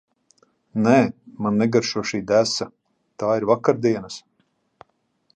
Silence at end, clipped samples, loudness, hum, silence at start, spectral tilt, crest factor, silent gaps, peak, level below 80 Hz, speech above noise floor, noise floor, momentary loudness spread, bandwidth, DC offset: 1.15 s; under 0.1%; -21 LUFS; none; 0.75 s; -5.5 dB/octave; 22 dB; none; -2 dBFS; -62 dBFS; 48 dB; -68 dBFS; 12 LU; 9.4 kHz; under 0.1%